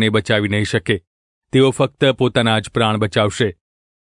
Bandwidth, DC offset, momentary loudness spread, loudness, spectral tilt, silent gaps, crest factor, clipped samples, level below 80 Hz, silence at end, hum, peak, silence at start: 11 kHz; under 0.1%; 6 LU; -17 LUFS; -5.5 dB/octave; 1.07-1.42 s; 16 dB; under 0.1%; -50 dBFS; 0.5 s; none; -2 dBFS; 0 s